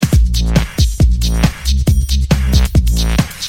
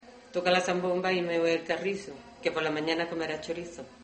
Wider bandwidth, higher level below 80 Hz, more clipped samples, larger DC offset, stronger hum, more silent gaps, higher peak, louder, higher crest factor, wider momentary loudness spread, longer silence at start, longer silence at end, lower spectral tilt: first, 16.5 kHz vs 8.4 kHz; first, -14 dBFS vs -66 dBFS; neither; neither; neither; neither; first, 0 dBFS vs -10 dBFS; first, -14 LUFS vs -30 LUFS; second, 12 dB vs 20 dB; second, 3 LU vs 11 LU; about the same, 0 s vs 0.05 s; about the same, 0 s vs 0 s; about the same, -5 dB/octave vs -4.5 dB/octave